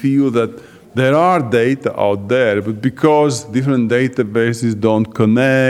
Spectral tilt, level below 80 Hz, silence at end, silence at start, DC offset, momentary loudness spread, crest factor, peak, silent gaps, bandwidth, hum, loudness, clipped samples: -6.5 dB/octave; -58 dBFS; 0 s; 0 s; under 0.1%; 5 LU; 14 dB; 0 dBFS; none; 13.5 kHz; none; -15 LUFS; under 0.1%